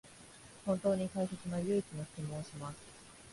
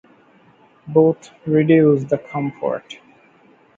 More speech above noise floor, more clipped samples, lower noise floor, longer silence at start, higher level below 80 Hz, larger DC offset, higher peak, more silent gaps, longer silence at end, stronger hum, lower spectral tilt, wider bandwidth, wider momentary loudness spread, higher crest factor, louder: second, 19 dB vs 35 dB; neither; first, -56 dBFS vs -52 dBFS; second, 0.05 s vs 0.85 s; about the same, -66 dBFS vs -62 dBFS; neither; second, -20 dBFS vs -2 dBFS; neither; second, 0 s vs 0.85 s; neither; second, -6.5 dB/octave vs -8.5 dB/octave; first, 11.5 kHz vs 7.6 kHz; first, 20 LU vs 15 LU; about the same, 18 dB vs 18 dB; second, -38 LUFS vs -18 LUFS